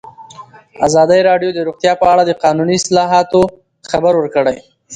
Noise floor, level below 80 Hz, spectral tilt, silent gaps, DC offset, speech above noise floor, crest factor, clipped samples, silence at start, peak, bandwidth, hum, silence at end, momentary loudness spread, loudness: -37 dBFS; -46 dBFS; -4.5 dB/octave; none; under 0.1%; 25 dB; 14 dB; under 0.1%; 0.05 s; 0 dBFS; 10 kHz; none; 0 s; 8 LU; -13 LUFS